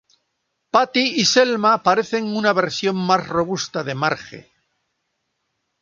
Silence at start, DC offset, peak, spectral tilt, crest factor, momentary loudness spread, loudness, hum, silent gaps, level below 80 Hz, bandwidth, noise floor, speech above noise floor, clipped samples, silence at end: 0.75 s; under 0.1%; 0 dBFS; -3.5 dB/octave; 20 dB; 8 LU; -19 LUFS; none; none; -60 dBFS; 7.6 kHz; -74 dBFS; 55 dB; under 0.1%; 1.4 s